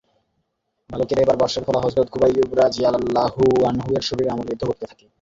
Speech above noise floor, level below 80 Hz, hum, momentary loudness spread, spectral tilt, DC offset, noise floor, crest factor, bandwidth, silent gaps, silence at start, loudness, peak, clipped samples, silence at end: 53 dB; -48 dBFS; none; 9 LU; -6 dB/octave; under 0.1%; -73 dBFS; 16 dB; 7.8 kHz; none; 0.9 s; -20 LUFS; -4 dBFS; under 0.1%; 0.35 s